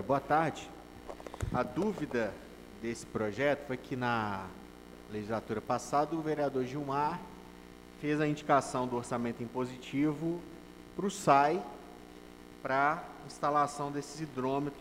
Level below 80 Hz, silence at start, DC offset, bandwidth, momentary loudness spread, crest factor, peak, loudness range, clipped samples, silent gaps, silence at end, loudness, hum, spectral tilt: -58 dBFS; 0 s; under 0.1%; 16 kHz; 20 LU; 22 dB; -12 dBFS; 4 LU; under 0.1%; none; 0 s; -33 LUFS; 60 Hz at -55 dBFS; -5.5 dB/octave